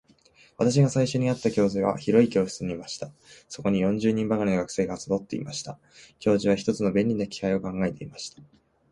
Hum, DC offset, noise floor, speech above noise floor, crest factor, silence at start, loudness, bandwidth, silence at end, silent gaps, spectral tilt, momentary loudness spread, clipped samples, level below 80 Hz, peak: none; under 0.1%; -58 dBFS; 33 dB; 20 dB; 0.6 s; -25 LUFS; 11.5 kHz; 0.5 s; none; -6.5 dB/octave; 15 LU; under 0.1%; -56 dBFS; -6 dBFS